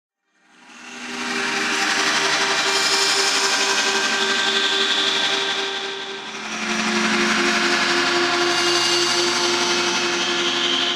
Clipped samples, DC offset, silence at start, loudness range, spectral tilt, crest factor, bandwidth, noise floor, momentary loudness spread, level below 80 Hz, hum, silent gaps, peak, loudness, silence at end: under 0.1%; under 0.1%; 0.7 s; 2 LU; -1 dB/octave; 16 dB; 16 kHz; -57 dBFS; 9 LU; -66 dBFS; none; none; -4 dBFS; -18 LUFS; 0 s